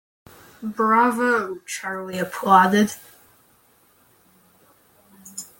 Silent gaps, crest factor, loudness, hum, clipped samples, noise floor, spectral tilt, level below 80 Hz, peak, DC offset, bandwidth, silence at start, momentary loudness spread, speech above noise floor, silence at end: none; 22 dB; -20 LUFS; none; under 0.1%; -58 dBFS; -4.5 dB/octave; -66 dBFS; -2 dBFS; under 0.1%; 17 kHz; 0.6 s; 20 LU; 38 dB; 0.15 s